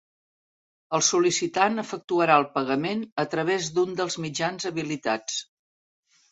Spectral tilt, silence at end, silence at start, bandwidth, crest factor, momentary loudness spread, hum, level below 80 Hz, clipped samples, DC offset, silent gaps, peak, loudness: -3.5 dB/octave; 0.9 s; 0.9 s; 8.4 kHz; 22 dB; 9 LU; none; -70 dBFS; under 0.1%; under 0.1%; 2.04-2.08 s, 3.12-3.16 s; -4 dBFS; -25 LUFS